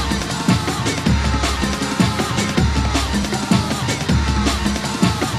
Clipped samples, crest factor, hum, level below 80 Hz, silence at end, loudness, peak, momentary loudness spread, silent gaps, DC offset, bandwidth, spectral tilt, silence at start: under 0.1%; 16 dB; none; -26 dBFS; 0 s; -19 LUFS; -2 dBFS; 2 LU; none; under 0.1%; 15 kHz; -4.5 dB/octave; 0 s